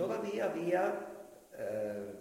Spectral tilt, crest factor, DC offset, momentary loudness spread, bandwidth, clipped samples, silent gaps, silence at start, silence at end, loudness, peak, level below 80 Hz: -6 dB/octave; 16 dB; under 0.1%; 16 LU; 16 kHz; under 0.1%; none; 0 s; 0 s; -36 LUFS; -20 dBFS; -76 dBFS